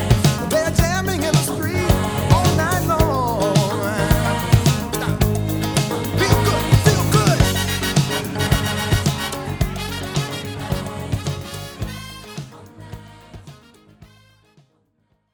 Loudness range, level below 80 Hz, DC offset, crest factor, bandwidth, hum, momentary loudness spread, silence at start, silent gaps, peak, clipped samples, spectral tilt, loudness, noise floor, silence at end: 14 LU; -30 dBFS; under 0.1%; 20 dB; over 20 kHz; none; 14 LU; 0 s; none; 0 dBFS; under 0.1%; -5 dB/octave; -19 LUFS; -65 dBFS; 1.3 s